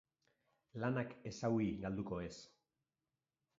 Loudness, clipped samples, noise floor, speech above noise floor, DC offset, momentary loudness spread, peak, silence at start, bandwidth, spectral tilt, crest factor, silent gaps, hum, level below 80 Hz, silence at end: -42 LUFS; under 0.1%; under -90 dBFS; over 49 dB; under 0.1%; 13 LU; -24 dBFS; 0.75 s; 7.6 kHz; -7 dB/octave; 20 dB; none; none; -66 dBFS; 1.1 s